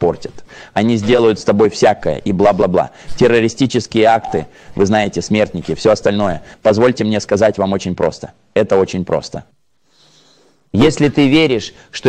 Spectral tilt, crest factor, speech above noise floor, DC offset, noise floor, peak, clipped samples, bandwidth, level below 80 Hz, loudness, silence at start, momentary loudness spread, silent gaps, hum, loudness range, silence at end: -6 dB/octave; 14 dB; 42 dB; under 0.1%; -56 dBFS; 0 dBFS; under 0.1%; 9.6 kHz; -42 dBFS; -14 LUFS; 0 s; 10 LU; none; none; 4 LU; 0 s